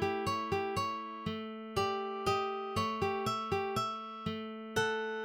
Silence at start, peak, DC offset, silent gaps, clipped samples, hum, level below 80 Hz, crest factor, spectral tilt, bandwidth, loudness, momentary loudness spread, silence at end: 0 s; -20 dBFS; under 0.1%; none; under 0.1%; none; -62 dBFS; 16 dB; -4.5 dB/octave; 17 kHz; -35 LUFS; 6 LU; 0 s